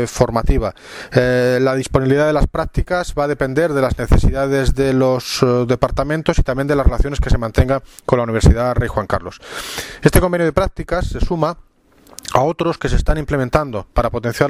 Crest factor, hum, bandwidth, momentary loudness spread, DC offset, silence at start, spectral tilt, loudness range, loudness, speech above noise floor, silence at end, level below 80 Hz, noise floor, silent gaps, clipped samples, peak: 16 dB; none; 15.5 kHz; 7 LU; under 0.1%; 0 s; -6 dB/octave; 3 LU; -17 LUFS; 32 dB; 0 s; -22 dBFS; -48 dBFS; none; under 0.1%; 0 dBFS